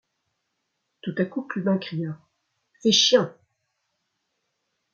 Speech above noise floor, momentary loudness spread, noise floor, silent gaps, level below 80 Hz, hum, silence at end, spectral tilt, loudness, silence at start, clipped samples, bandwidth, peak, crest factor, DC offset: 55 dB; 17 LU; -78 dBFS; none; -72 dBFS; none; 1.6 s; -3.5 dB/octave; -23 LUFS; 1.05 s; under 0.1%; 7.2 kHz; -6 dBFS; 22 dB; under 0.1%